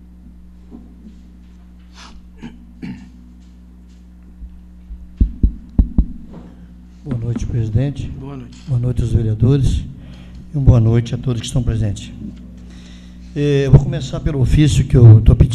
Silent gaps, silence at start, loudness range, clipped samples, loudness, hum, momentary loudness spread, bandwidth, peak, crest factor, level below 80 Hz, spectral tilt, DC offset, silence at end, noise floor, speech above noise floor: none; 0.25 s; 21 LU; under 0.1%; -16 LUFS; none; 25 LU; 10 kHz; 0 dBFS; 16 dB; -24 dBFS; -8 dB/octave; under 0.1%; 0 s; -40 dBFS; 27 dB